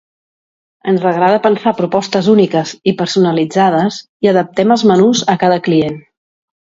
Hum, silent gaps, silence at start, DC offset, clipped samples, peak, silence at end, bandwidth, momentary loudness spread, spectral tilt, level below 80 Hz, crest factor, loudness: none; 4.09-4.20 s; 0.85 s; under 0.1%; under 0.1%; 0 dBFS; 0.75 s; 7.8 kHz; 6 LU; -5.5 dB/octave; -56 dBFS; 14 dB; -13 LUFS